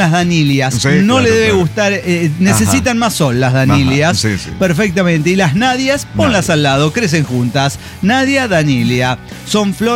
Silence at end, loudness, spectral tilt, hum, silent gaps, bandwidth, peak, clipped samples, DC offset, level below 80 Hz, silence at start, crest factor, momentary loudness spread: 0 s; -12 LUFS; -5 dB/octave; none; none; 17 kHz; -2 dBFS; under 0.1%; under 0.1%; -36 dBFS; 0 s; 10 dB; 5 LU